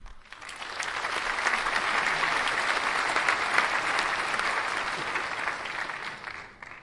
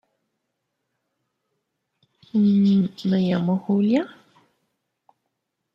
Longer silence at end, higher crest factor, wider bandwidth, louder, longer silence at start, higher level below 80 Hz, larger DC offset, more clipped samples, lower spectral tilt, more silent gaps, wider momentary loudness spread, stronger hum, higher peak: second, 0 s vs 1.65 s; first, 22 dB vs 16 dB; first, 11.5 kHz vs 7 kHz; second, -27 LUFS vs -21 LUFS; second, 0 s vs 2.35 s; first, -56 dBFS vs -68 dBFS; neither; neither; second, -1 dB/octave vs -9 dB/octave; neither; first, 14 LU vs 6 LU; neither; about the same, -6 dBFS vs -8 dBFS